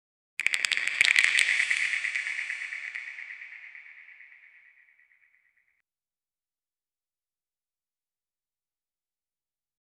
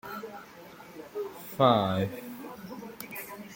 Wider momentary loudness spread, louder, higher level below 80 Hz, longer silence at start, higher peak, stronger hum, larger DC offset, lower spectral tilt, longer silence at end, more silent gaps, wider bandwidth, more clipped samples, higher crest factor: about the same, 23 LU vs 23 LU; first, -25 LUFS vs -30 LUFS; second, -82 dBFS vs -68 dBFS; first, 0.4 s vs 0.05 s; first, 0 dBFS vs -8 dBFS; neither; neither; second, 3.5 dB/octave vs -6 dB/octave; first, 5.65 s vs 0 s; neither; second, 12 kHz vs 17 kHz; neither; first, 32 dB vs 24 dB